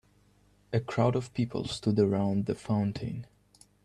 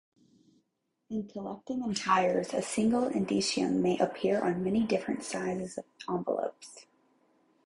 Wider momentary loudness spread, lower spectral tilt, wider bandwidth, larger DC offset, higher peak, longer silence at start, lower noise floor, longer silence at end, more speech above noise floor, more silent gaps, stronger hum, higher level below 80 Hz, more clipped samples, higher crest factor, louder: second, 8 LU vs 12 LU; first, -7.5 dB/octave vs -5 dB/octave; about the same, 11 kHz vs 11.5 kHz; neither; about the same, -12 dBFS vs -12 dBFS; second, 0.7 s vs 1.1 s; second, -64 dBFS vs -80 dBFS; second, 0.6 s vs 0.85 s; second, 35 dB vs 49 dB; neither; first, 50 Hz at -45 dBFS vs none; first, -60 dBFS vs -66 dBFS; neither; about the same, 18 dB vs 20 dB; about the same, -30 LUFS vs -31 LUFS